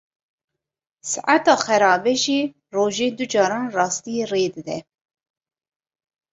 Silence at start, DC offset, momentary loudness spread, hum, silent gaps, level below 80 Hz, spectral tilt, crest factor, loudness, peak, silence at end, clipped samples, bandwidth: 1.05 s; under 0.1%; 11 LU; none; none; -68 dBFS; -3 dB/octave; 22 dB; -20 LUFS; -2 dBFS; 1.5 s; under 0.1%; 8.2 kHz